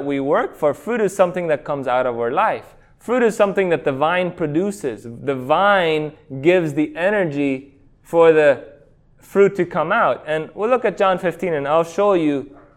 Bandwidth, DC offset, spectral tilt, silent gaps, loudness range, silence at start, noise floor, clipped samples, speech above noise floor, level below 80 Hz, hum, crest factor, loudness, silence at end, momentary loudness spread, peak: 14.5 kHz; under 0.1%; -6 dB/octave; none; 2 LU; 0 s; -50 dBFS; under 0.1%; 32 dB; -54 dBFS; none; 18 dB; -19 LUFS; 0.3 s; 9 LU; -2 dBFS